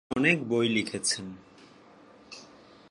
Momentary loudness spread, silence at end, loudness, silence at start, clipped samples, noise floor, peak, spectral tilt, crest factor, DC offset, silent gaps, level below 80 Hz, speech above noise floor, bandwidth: 23 LU; 0.45 s; -27 LUFS; 0.1 s; under 0.1%; -54 dBFS; -8 dBFS; -3.5 dB/octave; 24 dB; under 0.1%; none; -66 dBFS; 27 dB; 11.5 kHz